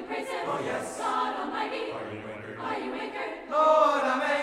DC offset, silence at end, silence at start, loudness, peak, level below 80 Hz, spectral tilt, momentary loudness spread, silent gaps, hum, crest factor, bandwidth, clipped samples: under 0.1%; 0 s; 0 s; -28 LUFS; -10 dBFS; -66 dBFS; -4 dB/octave; 15 LU; none; none; 18 dB; 13.5 kHz; under 0.1%